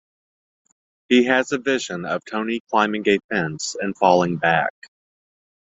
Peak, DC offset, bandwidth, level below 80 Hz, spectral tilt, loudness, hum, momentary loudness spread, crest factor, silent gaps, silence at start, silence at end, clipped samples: -2 dBFS; under 0.1%; 8 kHz; -64 dBFS; -4.5 dB/octave; -20 LUFS; none; 9 LU; 20 dB; 2.60-2.65 s, 3.24-3.29 s; 1.1 s; 0.9 s; under 0.1%